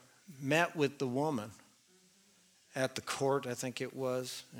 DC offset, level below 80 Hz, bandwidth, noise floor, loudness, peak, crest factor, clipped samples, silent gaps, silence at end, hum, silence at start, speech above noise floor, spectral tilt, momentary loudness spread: under 0.1%; -80 dBFS; 19 kHz; -67 dBFS; -35 LUFS; -14 dBFS; 24 dB; under 0.1%; none; 0 s; none; 0.3 s; 32 dB; -4.5 dB/octave; 10 LU